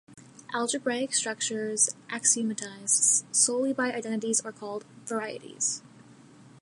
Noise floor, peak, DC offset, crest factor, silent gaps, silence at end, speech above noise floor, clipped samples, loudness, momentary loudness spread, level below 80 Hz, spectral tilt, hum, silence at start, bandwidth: -53 dBFS; -8 dBFS; under 0.1%; 20 dB; none; 0.05 s; 24 dB; under 0.1%; -26 LUFS; 15 LU; -80 dBFS; -1.5 dB/octave; none; 0.1 s; 11.5 kHz